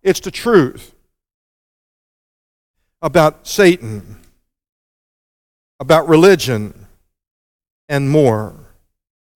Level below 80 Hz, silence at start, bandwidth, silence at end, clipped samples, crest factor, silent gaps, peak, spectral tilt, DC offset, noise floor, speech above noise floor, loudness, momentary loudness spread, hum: -46 dBFS; 0.05 s; 17.5 kHz; 0.85 s; under 0.1%; 18 dB; 1.34-2.74 s, 4.69-5.79 s, 7.31-7.60 s, 7.70-7.88 s; 0 dBFS; -5.5 dB/octave; under 0.1%; under -90 dBFS; over 77 dB; -14 LUFS; 20 LU; none